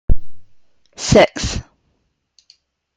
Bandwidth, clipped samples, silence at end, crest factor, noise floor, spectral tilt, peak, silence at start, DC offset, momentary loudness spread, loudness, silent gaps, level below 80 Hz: 9.4 kHz; under 0.1%; 1.35 s; 16 dB; -67 dBFS; -4.5 dB/octave; 0 dBFS; 0.1 s; under 0.1%; 14 LU; -17 LUFS; none; -26 dBFS